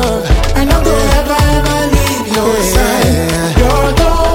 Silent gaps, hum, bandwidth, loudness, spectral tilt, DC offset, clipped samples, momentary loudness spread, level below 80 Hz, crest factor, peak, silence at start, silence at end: none; none; 17 kHz; -11 LUFS; -5 dB/octave; under 0.1%; under 0.1%; 2 LU; -14 dBFS; 10 dB; 0 dBFS; 0 s; 0 s